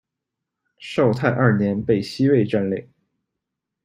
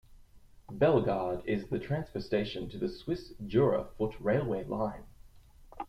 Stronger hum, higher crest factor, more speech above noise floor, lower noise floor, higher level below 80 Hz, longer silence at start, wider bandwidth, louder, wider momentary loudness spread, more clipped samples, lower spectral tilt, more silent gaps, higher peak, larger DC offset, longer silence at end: neither; about the same, 20 dB vs 18 dB; first, 64 dB vs 25 dB; first, -83 dBFS vs -56 dBFS; about the same, -56 dBFS vs -52 dBFS; first, 0.8 s vs 0.1 s; second, 11 kHz vs 14 kHz; first, -20 LUFS vs -32 LUFS; about the same, 9 LU vs 10 LU; neither; about the same, -8 dB/octave vs -8.5 dB/octave; neither; first, -2 dBFS vs -14 dBFS; neither; first, 1 s vs 0 s